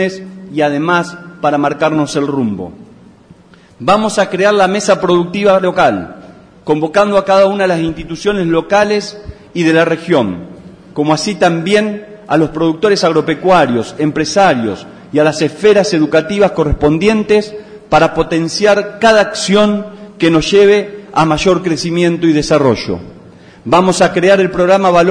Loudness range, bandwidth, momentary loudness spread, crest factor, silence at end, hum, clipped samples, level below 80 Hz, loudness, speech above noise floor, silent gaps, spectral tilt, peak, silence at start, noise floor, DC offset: 3 LU; 10.5 kHz; 11 LU; 12 dB; 0 s; none; under 0.1%; -38 dBFS; -12 LUFS; 30 dB; none; -5 dB/octave; 0 dBFS; 0 s; -41 dBFS; under 0.1%